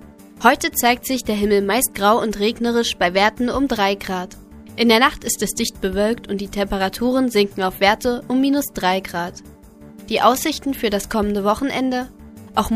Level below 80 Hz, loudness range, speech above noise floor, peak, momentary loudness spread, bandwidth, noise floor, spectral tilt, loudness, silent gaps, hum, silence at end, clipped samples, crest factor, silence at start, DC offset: -42 dBFS; 3 LU; 23 dB; 0 dBFS; 8 LU; 15.5 kHz; -42 dBFS; -3.5 dB/octave; -19 LUFS; none; none; 0 s; under 0.1%; 20 dB; 0 s; under 0.1%